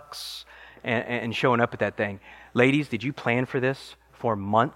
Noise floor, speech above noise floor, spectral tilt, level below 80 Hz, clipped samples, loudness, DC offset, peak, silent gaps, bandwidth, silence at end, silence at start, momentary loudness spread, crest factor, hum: -44 dBFS; 19 dB; -6 dB/octave; -62 dBFS; under 0.1%; -26 LUFS; under 0.1%; -4 dBFS; none; 16.5 kHz; 0 s; 0.1 s; 15 LU; 22 dB; none